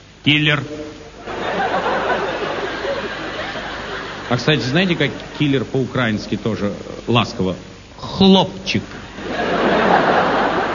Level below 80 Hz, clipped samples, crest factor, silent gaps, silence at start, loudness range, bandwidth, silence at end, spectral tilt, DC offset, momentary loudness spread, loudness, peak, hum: -44 dBFS; under 0.1%; 18 dB; none; 0 s; 5 LU; 7.4 kHz; 0 s; -5.5 dB/octave; under 0.1%; 15 LU; -18 LUFS; 0 dBFS; none